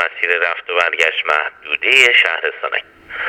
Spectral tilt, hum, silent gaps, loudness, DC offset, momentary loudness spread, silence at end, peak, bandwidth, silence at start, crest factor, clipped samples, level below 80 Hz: 0 dB/octave; none; none; -14 LUFS; under 0.1%; 13 LU; 0 s; 0 dBFS; 20 kHz; 0 s; 16 dB; under 0.1%; -62 dBFS